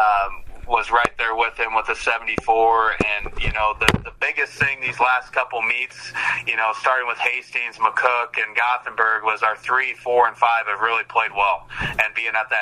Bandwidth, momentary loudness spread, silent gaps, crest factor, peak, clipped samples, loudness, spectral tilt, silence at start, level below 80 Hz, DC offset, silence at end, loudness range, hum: 14 kHz; 5 LU; none; 20 dB; 0 dBFS; under 0.1%; -20 LUFS; -3.5 dB/octave; 0 s; -40 dBFS; under 0.1%; 0 s; 1 LU; none